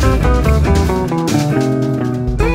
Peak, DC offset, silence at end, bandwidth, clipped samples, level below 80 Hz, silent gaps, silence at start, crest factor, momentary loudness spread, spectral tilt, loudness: 0 dBFS; under 0.1%; 0 s; 16 kHz; under 0.1%; -18 dBFS; none; 0 s; 12 dB; 4 LU; -7 dB/octave; -15 LUFS